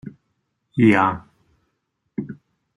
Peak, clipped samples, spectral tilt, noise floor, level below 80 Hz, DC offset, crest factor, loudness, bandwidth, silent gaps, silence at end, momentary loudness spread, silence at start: -2 dBFS; under 0.1%; -8 dB/octave; -74 dBFS; -60 dBFS; under 0.1%; 20 dB; -18 LUFS; 11 kHz; none; 0.4 s; 24 LU; 0.05 s